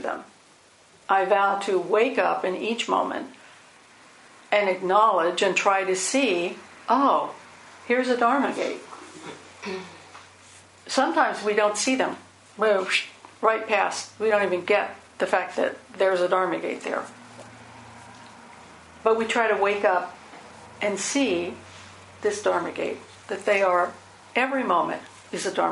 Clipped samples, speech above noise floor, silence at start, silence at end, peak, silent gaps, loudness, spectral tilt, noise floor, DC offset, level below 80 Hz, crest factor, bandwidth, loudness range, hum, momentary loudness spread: under 0.1%; 31 dB; 0 s; 0 s; -6 dBFS; none; -24 LUFS; -3 dB/octave; -55 dBFS; under 0.1%; -68 dBFS; 20 dB; 11.5 kHz; 5 LU; none; 21 LU